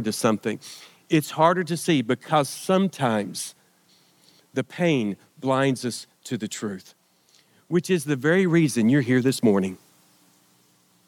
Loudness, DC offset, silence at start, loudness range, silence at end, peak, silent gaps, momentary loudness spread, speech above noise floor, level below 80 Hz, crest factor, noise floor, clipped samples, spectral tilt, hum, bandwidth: -23 LUFS; under 0.1%; 0 s; 5 LU; 1.3 s; -4 dBFS; none; 13 LU; 39 dB; -78 dBFS; 20 dB; -61 dBFS; under 0.1%; -5.5 dB/octave; none; 18 kHz